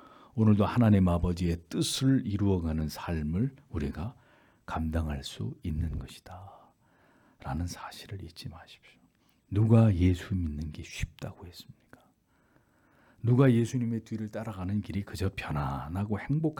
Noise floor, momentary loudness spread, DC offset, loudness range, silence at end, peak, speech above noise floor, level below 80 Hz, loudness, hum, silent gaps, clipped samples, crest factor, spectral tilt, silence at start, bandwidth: -67 dBFS; 19 LU; under 0.1%; 11 LU; 0.05 s; -10 dBFS; 39 dB; -48 dBFS; -30 LUFS; none; none; under 0.1%; 20 dB; -7 dB/octave; 0.35 s; 18 kHz